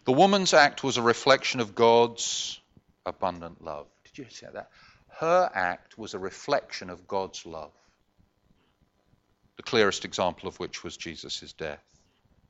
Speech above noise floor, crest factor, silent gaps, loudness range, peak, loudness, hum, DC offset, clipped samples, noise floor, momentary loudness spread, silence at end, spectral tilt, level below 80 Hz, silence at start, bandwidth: 42 dB; 22 dB; none; 11 LU; -6 dBFS; -26 LUFS; none; under 0.1%; under 0.1%; -68 dBFS; 21 LU; 0.75 s; -3.5 dB/octave; -64 dBFS; 0.05 s; 8.2 kHz